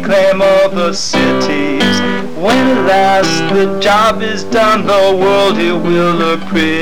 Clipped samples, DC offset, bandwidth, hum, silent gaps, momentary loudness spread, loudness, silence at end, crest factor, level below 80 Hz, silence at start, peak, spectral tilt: under 0.1%; 8%; 19 kHz; none; none; 5 LU; -11 LUFS; 0 s; 6 dB; -40 dBFS; 0 s; -4 dBFS; -4.5 dB/octave